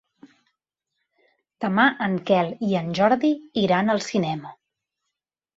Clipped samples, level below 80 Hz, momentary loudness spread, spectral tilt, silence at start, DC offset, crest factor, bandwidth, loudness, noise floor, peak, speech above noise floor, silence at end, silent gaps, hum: under 0.1%; -66 dBFS; 9 LU; -6 dB/octave; 1.6 s; under 0.1%; 20 dB; 8 kHz; -22 LUFS; -83 dBFS; -4 dBFS; 62 dB; 1.05 s; none; none